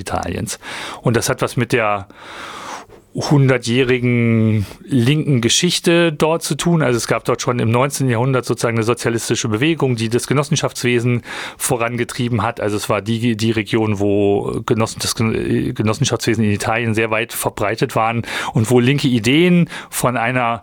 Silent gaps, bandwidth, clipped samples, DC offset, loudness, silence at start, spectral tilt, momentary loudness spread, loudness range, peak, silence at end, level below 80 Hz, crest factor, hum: none; 19.5 kHz; under 0.1%; under 0.1%; -17 LUFS; 0 s; -5 dB/octave; 8 LU; 3 LU; -2 dBFS; 0 s; -46 dBFS; 14 dB; none